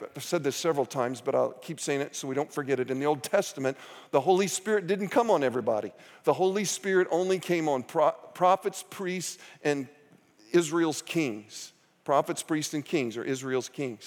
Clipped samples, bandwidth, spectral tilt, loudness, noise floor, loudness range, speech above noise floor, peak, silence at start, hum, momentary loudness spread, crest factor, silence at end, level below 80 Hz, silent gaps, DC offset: under 0.1%; 18.5 kHz; -4.5 dB/octave; -28 LUFS; -59 dBFS; 3 LU; 31 dB; -10 dBFS; 0 s; none; 9 LU; 18 dB; 0 s; -86 dBFS; none; under 0.1%